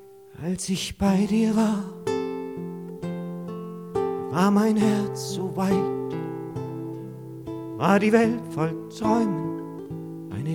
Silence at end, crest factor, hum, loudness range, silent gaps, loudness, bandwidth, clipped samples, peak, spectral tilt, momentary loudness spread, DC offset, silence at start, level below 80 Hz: 0 s; 20 dB; none; 2 LU; none; -25 LUFS; 16 kHz; under 0.1%; -6 dBFS; -6 dB/octave; 15 LU; under 0.1%; 0 s; -54 dBFS